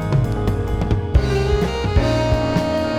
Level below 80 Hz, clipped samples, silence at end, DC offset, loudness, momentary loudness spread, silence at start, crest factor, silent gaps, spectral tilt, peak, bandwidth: -24 dBFS; under 0.1%; 0 s; under 0.1%; -19 LUFS; 3 LU; 0 s; 16 dB; none; -7 dB/octave; -2 dBFS; 14 kHz